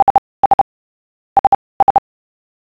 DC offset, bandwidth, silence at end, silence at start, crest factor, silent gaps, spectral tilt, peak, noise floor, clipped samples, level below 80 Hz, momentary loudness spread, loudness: under 0.1%; 5 kHz; 0.75 s; 0 s; 14 dB; 0.02-1.95 s; -7 dB/octave; -2 dBFS; under -90 dBFS; under 0.1%; -46 dBFS; 5 LU; -15 LUFS